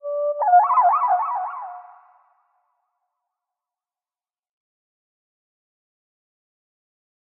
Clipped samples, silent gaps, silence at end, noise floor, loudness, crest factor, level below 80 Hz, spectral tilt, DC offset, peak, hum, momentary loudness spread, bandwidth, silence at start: under 0.1%; none; 5.55 s; under -90 dBFS; -19 LUFS; 20 dB; under -90 dBFS; 2 dB/octave; under 0.1%; -6 dBFS; none; 17 LU; 2.8 kHz; 0.05 s